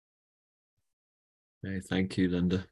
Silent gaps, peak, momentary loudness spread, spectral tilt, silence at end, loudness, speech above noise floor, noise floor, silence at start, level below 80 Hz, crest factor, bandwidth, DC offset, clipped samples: none; -16 dBFS; 11 LU; -7 dB/octave; 0.05 s; -31 LUFS; over 60 dB; under -90 dBFS; 1.65 s; -52 dBFS; 18 dB; 12 kHz; under 0.1%; under 0.1%